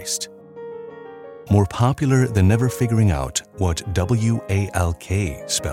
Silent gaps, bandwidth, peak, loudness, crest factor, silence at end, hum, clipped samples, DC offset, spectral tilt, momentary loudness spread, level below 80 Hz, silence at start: none; 16 kHz; -2 dBFS; -20 LUFS; 18 dB; 0 s; none; under 0.1%; under 0.1%; -5.5 dB/octave; 19 LU; -40 dBFS; 0 s